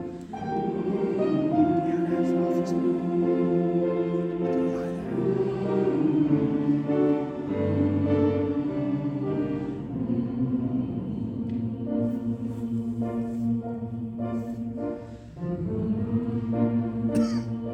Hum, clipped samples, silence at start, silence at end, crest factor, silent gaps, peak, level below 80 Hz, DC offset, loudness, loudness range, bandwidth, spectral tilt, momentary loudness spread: none; under 0.1%; 0 s; 0 s; 16 dB; none; -10 dBFS; -54 dBFS; under 0.1%; -27 LUFS; 6 LU; 9.6 kHz; -9.5 dB/octave; 8 LU